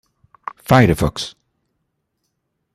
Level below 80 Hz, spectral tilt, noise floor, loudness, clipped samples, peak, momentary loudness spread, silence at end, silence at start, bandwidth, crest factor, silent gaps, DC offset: -40 dBFS; -6 dB/octave; -73 dBFS; -16 LUFS; under 0.1%; -2 dBFS; 21 LU; 1.45 s; 0.7 s; 14.5 kHz; 20 dB; none; under 0.1%